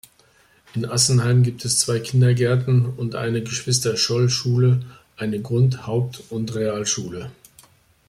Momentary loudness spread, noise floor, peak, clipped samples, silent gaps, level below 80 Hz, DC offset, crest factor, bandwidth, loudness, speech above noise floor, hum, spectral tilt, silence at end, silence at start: 12 LU; -57 dBFS; -4 dBFS; under 0.1%; none; -56 dBFS; under 0.1%; 18 dB; 14 kHz; -20 LUFS; 37 dB; none; -4.5 dB/octave; 0.75 s; 0.75 s